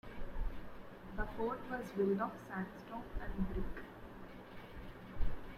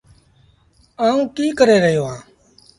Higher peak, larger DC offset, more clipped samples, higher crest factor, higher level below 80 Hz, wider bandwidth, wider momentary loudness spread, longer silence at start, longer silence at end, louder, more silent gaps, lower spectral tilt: second, -22 dBFS vs 0 dBFS; neither; neither; about the same, 18 dB vs 18 dB; first, -46 dBFS vs -54 dBFS; first, 13.5 kHz vs 11.5 kHz; first, 16 LU vs 13 LU; second, 0.05 s vs 1 s; second, 0 s vs 0.6 s; second, -43 LUFS vs -17 LUFS; neither; first, -8 dB/octave vs -5.5 dB/octave